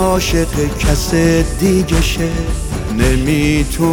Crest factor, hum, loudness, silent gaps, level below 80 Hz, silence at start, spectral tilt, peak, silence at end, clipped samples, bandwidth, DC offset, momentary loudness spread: 14 dB; none; -15 LUFS; none; -20 dBFS; 0 s; -5 dB/octave; 0 dBFS; 0 s; under 0.1%; 19 kHz; under 0.1%; 6 LU